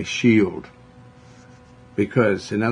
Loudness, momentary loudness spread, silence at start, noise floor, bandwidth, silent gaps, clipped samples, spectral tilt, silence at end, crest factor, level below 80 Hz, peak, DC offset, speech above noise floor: -20 LUFS; 13 LU; 0 s; -47 dBFS; 10.5 kHz; none; under 0.1%; -6 dB/octave; 0 s; 18 dB; -58 dBFS; -4 dBFS; under 0.1%; 27 dB